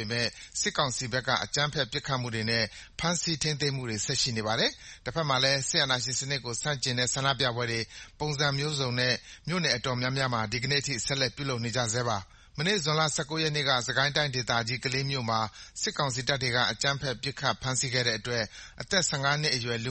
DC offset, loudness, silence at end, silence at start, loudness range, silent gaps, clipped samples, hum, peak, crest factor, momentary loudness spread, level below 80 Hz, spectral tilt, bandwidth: under 0.1%; -28 LUFS; 0 s; 0 s; 2 LU; none; under 0.1%; none; -8 dBFS; 22 dB; 7 LU; -54 dBFS; -3 dB/octave; 8.8 kHz